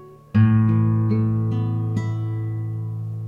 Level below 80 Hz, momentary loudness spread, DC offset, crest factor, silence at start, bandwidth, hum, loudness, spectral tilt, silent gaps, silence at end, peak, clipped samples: -48 dBFS; 11 LU; under 0.1%; 14 dB; 0 s; 3.5 kHz; none; -21 LUFS; -10 dB/octave; none; 0 s; -6 dBFS; under 0.1%